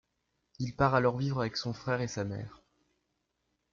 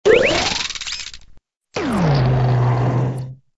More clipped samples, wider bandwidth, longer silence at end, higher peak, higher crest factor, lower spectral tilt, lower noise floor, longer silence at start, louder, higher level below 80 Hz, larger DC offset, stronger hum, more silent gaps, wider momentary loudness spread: neither; second, 7.4 kHz vs 11 kHz; first, 1.15 s vs 0.2 s; second, -12 dBFS vs 0 dBFS; about the same, 20 dB vs 18 dB; about the same, -6 dB/octave vs -5.5 dB/octave; first, -80 dBFS vs -47 dBFS; first, 0.6 s vs 0.05 s; second, -32 LUFS vs -18 LUFS; second, -58 dBFS vs -38 dBFS; neither; neither; neither; about the same, 13 LU vs 14 LU